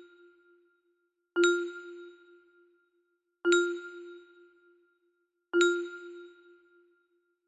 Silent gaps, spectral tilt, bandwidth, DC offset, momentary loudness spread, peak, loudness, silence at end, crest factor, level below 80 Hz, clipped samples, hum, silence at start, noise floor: none; -1 dB/octave; 8 kHz; under 0.1%; 23 LU; -10 dBFS; -29 LUFS; 1.2 s; 24 dB; -80 dBFS; under 0.1%; none; 1.35 s; -77 dBFS